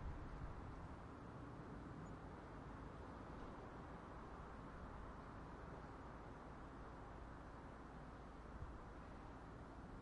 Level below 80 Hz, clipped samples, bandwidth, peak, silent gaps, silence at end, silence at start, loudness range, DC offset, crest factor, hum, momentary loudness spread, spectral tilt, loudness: -60 dBFS; under 0.1%; 10.5 kHz; -38 dBFS; none; 0 s; 0 s; 2 LU; under 0.1%; 16 dB; none; 3 LU; -7.5 dB/octave; -56 LUFS